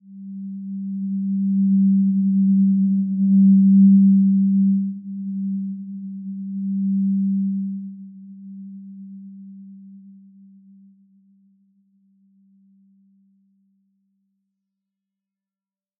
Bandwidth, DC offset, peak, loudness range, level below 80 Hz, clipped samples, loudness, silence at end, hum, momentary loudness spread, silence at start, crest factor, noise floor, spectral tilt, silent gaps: 0.6 kHz; under 0.1%; -6 dBFS; 20 LU; under -90 dBFS; under 0.1%; -19 LUFS; 5.9 s; none; 25 LU; 0.1 s; 14 dB; under -90 dBFS; -20.5 dB/octave; none